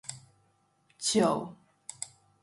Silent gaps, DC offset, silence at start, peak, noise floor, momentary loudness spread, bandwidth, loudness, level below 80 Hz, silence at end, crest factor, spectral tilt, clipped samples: none; under 0.1%; 0.1 s; -12 dBFS; -70 dBFS; 21 LU; 11.5 kHz; -30 LUFS; -72 dBFS; 0.35 s; 22 dB; -3.5 dB/octave; under 0.1%